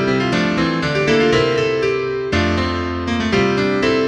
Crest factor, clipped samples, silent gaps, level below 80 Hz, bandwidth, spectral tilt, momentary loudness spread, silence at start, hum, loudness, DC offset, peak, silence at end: 14 dB; under 0.1%; none; -38 dBFS; 10 kHz; -5.5 dB/octave; 6 LU; 0 s; none; -17 LUFS; under 0.1%; -4 dBFS; 0 s